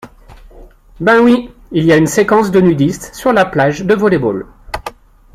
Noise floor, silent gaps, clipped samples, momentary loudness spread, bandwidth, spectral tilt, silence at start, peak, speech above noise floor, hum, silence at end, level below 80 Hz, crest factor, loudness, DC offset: -38 dBFS; none; under 0.1%; 16 LU; 15.5 kHz; -6 dB/octave; 0.05 s; 0 dBFS; 27 dB; none; 0.45 s; -40 dBFS; 12 dB; -12 LUFS; under 0.1%